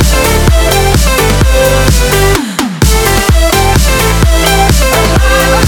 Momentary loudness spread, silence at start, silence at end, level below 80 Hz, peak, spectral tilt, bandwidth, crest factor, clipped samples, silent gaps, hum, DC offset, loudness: 1 LU; 0 s; 0 s; -12 dBFS; 0 dBFS; -4 dB/octave; 19.5 kHz; 8 dB; 0.4%; none; none; under 0.1%; -8 LUFS